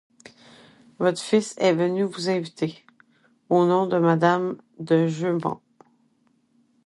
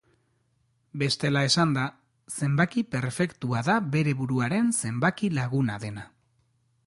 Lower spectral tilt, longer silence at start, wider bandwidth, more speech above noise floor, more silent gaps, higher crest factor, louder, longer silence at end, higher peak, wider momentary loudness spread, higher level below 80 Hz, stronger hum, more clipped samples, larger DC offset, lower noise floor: about the same, -6 dB/octave vs -5 dB/octave; about the same, 1 s vs 0.95 s; about the same, 11.5 kHz vs 11.5 kHz; about the same, 43 dB vs 44 dB; neither; about the same, 18 dB vs 18 dB; first, -23 LUFS vs -26 LUFS; first, 1.3 s vs 0.8 s; first, -6 dBFS vs -10 dBFS; about the same, 11 LU vs 10 LU; second, -72 dBFS vs -62 dBFS; neither; neither; neither; second, -65 dBFS vs -70 dBFS